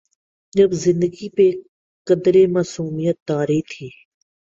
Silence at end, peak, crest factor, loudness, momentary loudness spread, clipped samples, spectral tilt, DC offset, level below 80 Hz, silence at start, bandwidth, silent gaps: 0.7 s; -4 dBFS; 16 dB; -18 LUFS; 18 LU; under 0.1%; -7 dB/octave; under 0.1%; -58 dBFS; 0.55 s; 7.8 kHz; 1.68-2.05 s, 3.22-3.26 s